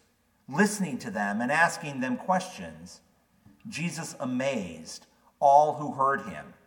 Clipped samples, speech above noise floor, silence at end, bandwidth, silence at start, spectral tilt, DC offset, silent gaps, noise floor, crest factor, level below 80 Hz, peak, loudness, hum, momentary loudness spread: under 0.1%; 33 dB; 0.15 s; 18 kHz; 0.5 s; -5 dB/octave; under 0.1%; none; -60 dBFS; 22 dB; -70 dBFS; -6 dBFS; -27 LUFS; none; 20 LU